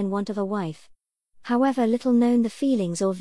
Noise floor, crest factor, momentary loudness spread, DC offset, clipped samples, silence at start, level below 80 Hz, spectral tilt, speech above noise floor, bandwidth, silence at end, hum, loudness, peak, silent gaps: -56 dBFS; 12 dB; 9 LU; 0.2%; under 0.1%; 0 s; -66 dBFS; -6.5 dB/octave; 33 dB; 12 kHz; 0 s; none; -23 LUFS; -12 dBFS; none